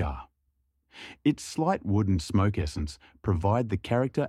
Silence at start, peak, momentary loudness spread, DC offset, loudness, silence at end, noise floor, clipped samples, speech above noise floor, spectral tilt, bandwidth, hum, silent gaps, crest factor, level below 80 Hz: 0 s; -12 dBFS; 11 LU; under 0.1%; -28 LUFS; 0 s; -74 dBFS; under 0.1%; 47 dB; -7 dB/octave; 12 kHz; none; none; 16 dB; -44 dBFS